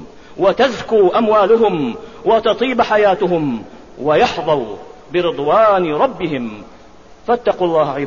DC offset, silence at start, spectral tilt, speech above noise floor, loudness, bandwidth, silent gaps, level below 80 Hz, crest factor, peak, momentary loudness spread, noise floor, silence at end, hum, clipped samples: 0.6%; 0 s; -6 dB/octave; 28 dB; -15 LUFS; 7.4 kHz; none; -48 dBFS; 14 dB; -2 dBFS; 12 LU; -42 dBFS; 0 s; none; under 0.1%